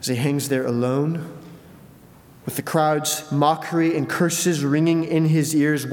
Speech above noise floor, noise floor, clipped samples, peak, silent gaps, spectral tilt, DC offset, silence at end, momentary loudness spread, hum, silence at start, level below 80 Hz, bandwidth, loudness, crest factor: 27 dB; -47 dBFS; under 0.1%; -4 dBFS; none; -5 dB/octave; under 0.1%; 0 s; 10 LU; none; 0 s; -64 dBFS; 19 kHz; -21 LUFS; 16 dB